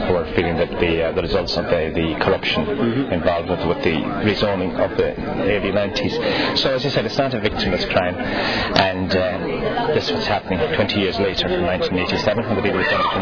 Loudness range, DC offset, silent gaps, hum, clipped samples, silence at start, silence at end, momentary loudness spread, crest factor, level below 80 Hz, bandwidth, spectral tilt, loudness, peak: 1 LU; 0.6%; none; none; under 0.1%; 0 s; 0 s; 3 LU; 18 dB; -38 dBFS; 5.4 kHz; -6 dB/octave; -19 LUFS; 0 dBFS